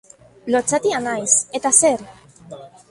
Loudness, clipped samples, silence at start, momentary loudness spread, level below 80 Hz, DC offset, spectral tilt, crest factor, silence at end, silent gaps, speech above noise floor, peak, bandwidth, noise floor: -17 LUFS; under 0.1%; 0.45 s; 9 LU; -60 dBFS; under 0.1%; -2 dB/octave; 20 dB; 0.25 s; none; 21 dB; 0 dBFS; 11.5 kHz; -39 dBFS